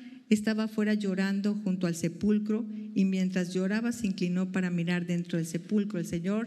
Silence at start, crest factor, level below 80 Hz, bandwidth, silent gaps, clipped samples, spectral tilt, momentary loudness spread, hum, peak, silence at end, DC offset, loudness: 0 s; 18 dB; -66 dBFS; 13 kHz; none; under 0.1%; -6.5 dB/octave; 5 LU; none; -12 dBFS; 0 s; under 0.1%; -30 LUFS